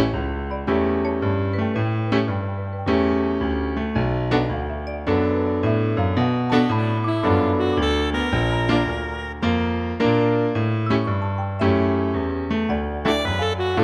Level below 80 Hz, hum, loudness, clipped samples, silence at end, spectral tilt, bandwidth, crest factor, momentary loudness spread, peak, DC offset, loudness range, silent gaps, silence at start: -36 dBFS; none; -22 LUFS; under 0.1%; 0 s; -7.5 dB/octave; 11 kHz; 16 dB; 6 LU; -6 dBFS; under 0.1%; 2 LU; none; 0 s